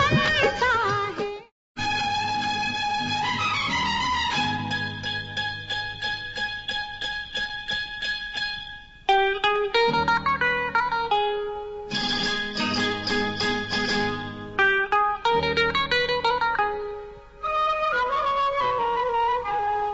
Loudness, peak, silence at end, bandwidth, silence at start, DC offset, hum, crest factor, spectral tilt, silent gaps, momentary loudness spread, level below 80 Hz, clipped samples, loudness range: -24 LUFS; -8 dBFS; 0 s; 8 kHz; 0 s; under 0.1%; none; 16 dB; -1 dB/octave; 1.52-1.75 s; 8 LU; -48 dBFS; under 0.1%; 5 LU